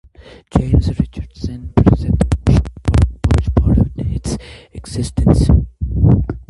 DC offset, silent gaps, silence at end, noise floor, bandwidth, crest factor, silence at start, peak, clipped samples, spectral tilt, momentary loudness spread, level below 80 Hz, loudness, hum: under 0.1%; none; 0.1 s; -34 dBFS; 11.5 kHz; 14 dB; 0.55 s; 0 dBFS; under 0.1%; -8 dB/octave; 13 LU; -20 dBFS; -16 LUFS; none